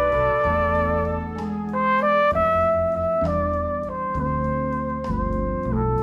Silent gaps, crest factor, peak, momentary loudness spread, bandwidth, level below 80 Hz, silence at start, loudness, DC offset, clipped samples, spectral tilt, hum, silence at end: none; 12 dB; -10 dBFS; 8 LU; 7.8 kHz; -34 dBFS; 0 s; -22 LUFS; under 0.1%; under 0.1%; -8.5 dB/octave; none; 0 s